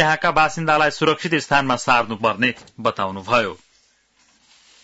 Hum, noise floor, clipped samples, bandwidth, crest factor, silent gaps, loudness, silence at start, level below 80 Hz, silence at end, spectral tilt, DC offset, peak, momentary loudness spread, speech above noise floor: none; -60 dBFS; under 0.1%; 8 kHz; 16 dB; none; -19 LUFS; 0 s; -52 dBFS; 1.3 s; -4.5 dB/octave; under 0.1%; -4 dBFS; 7 LU; 41 dB